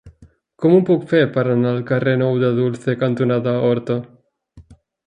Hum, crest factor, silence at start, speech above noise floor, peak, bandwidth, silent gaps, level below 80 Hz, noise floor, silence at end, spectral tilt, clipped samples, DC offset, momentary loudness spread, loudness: none; 18 dB; 0.05 s; 33 dB; -2 dBFS; 9.6 kHz; none; -56 dBFS; -50 dBFS; 0.45 s; -9 dB/octave; under 0.1%; under 0.1%; 6 LU; -18 LUFS